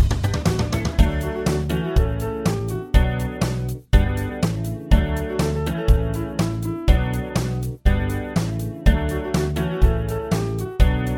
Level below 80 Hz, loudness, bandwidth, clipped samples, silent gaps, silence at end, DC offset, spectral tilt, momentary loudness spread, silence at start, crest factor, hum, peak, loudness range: -22 dBFS; -22 LUFS; 17 kHz; under 0.1%; none; 0 s; under 0.1%; -6.5 dB/octave; 4 LU; 0 s; 20 dB; none; 0 dBFS; 1 LU